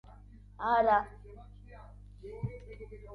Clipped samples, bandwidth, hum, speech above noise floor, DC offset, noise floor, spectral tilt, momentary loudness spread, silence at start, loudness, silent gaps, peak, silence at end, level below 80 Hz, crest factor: under 0.1%; 6.2 kHz; 50 Hz at -50 dBFS; 22 dB; under 0.1%; -53 dBFS; -8 dB/octave; 26 LU; 0.6 s; -31 LUFS; none; -14 dBFS; 0 s; -52 dBFS; 20 dB